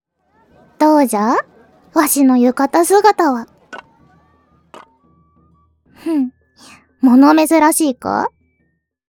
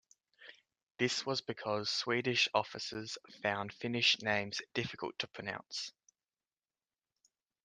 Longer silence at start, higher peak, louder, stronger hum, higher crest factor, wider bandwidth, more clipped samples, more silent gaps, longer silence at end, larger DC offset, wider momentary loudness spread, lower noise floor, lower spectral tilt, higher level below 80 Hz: first, 0.8 s vs 0.4 s; first, 0 dBFS vs -14 dBFS; first, -13 LUFS vs -35 LUFS; neither; second, 16 dB vs 24 dB; first, 19 kHz vs 10 kHz; neither; second, none vs 0.83-0.87 s; second, 0.85 s vs 1.75 s; neither; first, 15 LU vs 12 LU; second, -65 dBFS vs under -90 dBFS; about the same, -3.5 dB/octave vs -3 dB/octave; first, -62 dBFS vs -78 dBFS